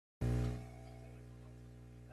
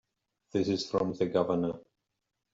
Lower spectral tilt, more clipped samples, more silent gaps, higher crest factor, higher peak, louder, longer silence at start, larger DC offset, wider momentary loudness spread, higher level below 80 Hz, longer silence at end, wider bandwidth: first, -8 dB/octave vs -6.5 dB/octave; neither; neither; about the same, 16 dB vs 18 dB; second, -26 dBFS vs -14 dBFS; second, -42 LUFS vs -31 LUFS; second, 0.2 s vs 0.55 s; neither; first, 18 LU vs 7 LU; first, -50 dBFS vs -66 dBFS; second, 0 s vs 0.75 s; first, 12.5 kHz vs 7.8 kHz